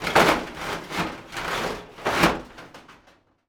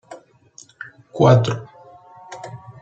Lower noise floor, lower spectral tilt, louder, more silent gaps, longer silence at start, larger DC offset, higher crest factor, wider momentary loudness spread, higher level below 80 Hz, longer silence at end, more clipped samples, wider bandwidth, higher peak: first, -58 dBFS vs -49 dBFS; second, -4 dB/octave vs -7 dB/octave; second, -25 LUFS vs -17 LUFS; neither; about the same, 0 s vs 0.1 s; neither; about the same, 24 dB vs 20 dB; second, 18 LU vs 24 LU; first, -48 dBFS vs -56 dBFS; first, 0.55 s vs 0.1 s; neither; first, over 20 kHz vs 8 kHz; about the same, -2 dBFS vs -2 dBFS